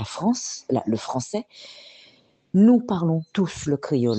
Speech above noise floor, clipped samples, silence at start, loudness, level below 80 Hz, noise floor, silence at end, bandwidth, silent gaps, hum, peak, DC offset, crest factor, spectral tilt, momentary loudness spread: 34 dB; under 0.1%; 0 s; -23 LUFS; -58 dBFS; -56 dBFS; 0 s; 8.8 kHz; none; none; -8 dBFS; under 0.1%; 16 dB; -6.5 dB/octave; 21 LU